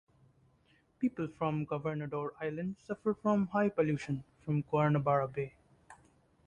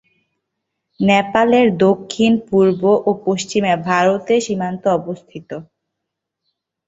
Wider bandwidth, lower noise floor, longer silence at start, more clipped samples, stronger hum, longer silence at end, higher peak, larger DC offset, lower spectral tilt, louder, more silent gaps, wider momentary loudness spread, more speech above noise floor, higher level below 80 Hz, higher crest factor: first, 9.6 kHz vs 8 kHz; second, -70 dBFS vs -79 dBFS; about the same, 1 s vs 1 s; neither; neither; second, 0.55 s vs 1.25 s; second, -16 dBFS vs -2 dBFS; neither; first, -8.5 dB/octave vs -5.5 dB/octave; second, -34 LUFS vs -16 LUFS; neither; second, 10 LU vs 16 LU; second, 36 dB vs 64 dB; second, -68 dBFS vs -56 dBFS; about the same, 18 dB vs 16 dB